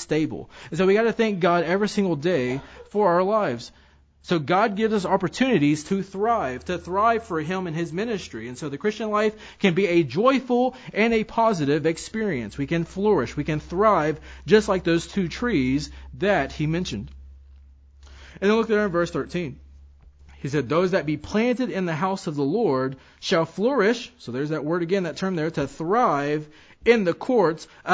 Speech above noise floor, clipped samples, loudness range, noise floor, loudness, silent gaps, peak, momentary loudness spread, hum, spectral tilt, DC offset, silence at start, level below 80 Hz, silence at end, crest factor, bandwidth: 27 dB; under 0.1%; 4 LU; -49 dBFS; -23 LUFS; none; -4 dBFS; 10 LU; none; -6 dB/octave; under 0.1%; 0 s; -48 dBFS; 0 s; 20 dB; 8 kHz